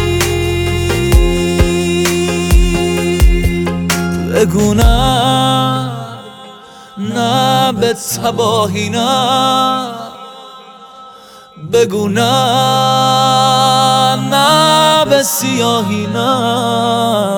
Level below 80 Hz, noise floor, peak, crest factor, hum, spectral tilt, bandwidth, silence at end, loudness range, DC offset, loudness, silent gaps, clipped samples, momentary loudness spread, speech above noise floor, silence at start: -20 dBFS; -37 dBFS; 0 dBFS; 12 dB; none; -4.5 dB/octave; over 20 kHz; 0 s; 6 LU; under 0.1%; -12 LUFS; none; under 0.1%; 9 LU; 26 dB; 0 s